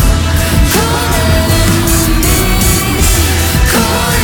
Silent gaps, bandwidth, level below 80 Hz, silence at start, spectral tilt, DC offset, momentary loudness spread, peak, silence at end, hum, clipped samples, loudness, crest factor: none; over 20 kHz; -14 dBFS; 0 s; -4 dB/octave; under 0.1%; 2 LU; 0 dBFS; 0 s; none; under 0.1%; -10 LUFS; 10 dB